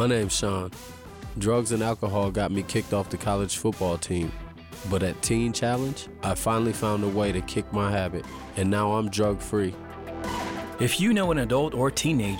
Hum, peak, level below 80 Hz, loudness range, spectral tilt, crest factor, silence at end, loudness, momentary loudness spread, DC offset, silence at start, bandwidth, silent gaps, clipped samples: none; -14 dBFS; -44 dBFS; 2 LU; -5 dB/octave; 12 dB; 0 s; -26 LUFS; 11 LU; under 0.1%; 0 s; 17.5 kHz; none; under 0.1%